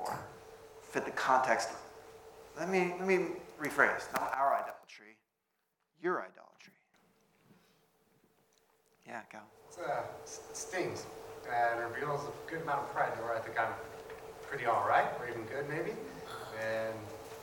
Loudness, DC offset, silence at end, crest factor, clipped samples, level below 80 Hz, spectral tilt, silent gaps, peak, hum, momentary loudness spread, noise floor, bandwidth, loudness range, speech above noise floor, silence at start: -35 LUFS; under 0.1%; 0 s; 26 dB; under 0.1%; -72 dBFS; -4.5 dB/octave; none; -12 dBFS; none; 21 LU; -83 dBFS; 18 kHz; 12 LU; 48 dB; 0 s